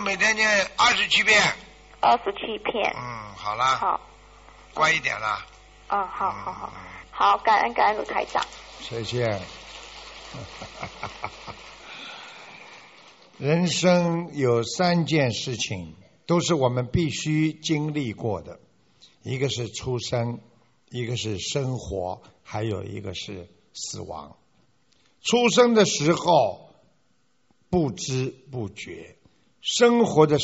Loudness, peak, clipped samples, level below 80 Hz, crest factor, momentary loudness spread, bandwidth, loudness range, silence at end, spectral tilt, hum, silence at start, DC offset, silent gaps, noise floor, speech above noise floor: -23 LUFS; -2 dBFS; under 0.1%; -52 dBFS; 22 dB; 20 LU; 8 kHz; 11 LU; 0 s; -3.5 dB/octave; none; 0 s; under 0.1%; none; -69 dBFS; 45 dB